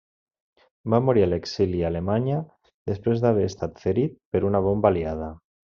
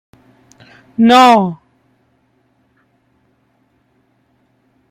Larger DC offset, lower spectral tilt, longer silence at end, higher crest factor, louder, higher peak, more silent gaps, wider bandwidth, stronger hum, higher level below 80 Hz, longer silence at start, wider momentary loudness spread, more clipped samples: neither; first, -7.5 dB/octave vs -5 dB/octave; second, 0.3 s vs 3.35 s; about the same, 20 dB vs 16 dB; second, -24 LUFS vs -10 LUFS; second, -4 dBFS vs 0 dBFS; first, 2.74-2.86 s, 4.25-4.32 s vs none; second, 7.2 kHz vs 15 kHz; neither; first, -50 dBFS vs -62 dBFS; second, 0.85 s vs 1 s; second, 12 LU vs 22 LU; neither